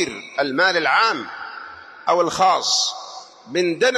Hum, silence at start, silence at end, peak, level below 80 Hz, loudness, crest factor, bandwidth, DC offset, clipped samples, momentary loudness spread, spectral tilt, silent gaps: none; 0 s; 0 s; -4 dBFS; -64 dBFS; -19 LUFS; 16 dB; 13 kHz; under 0.1%; under 0.1%; 18 LU; -2 dB/octave; none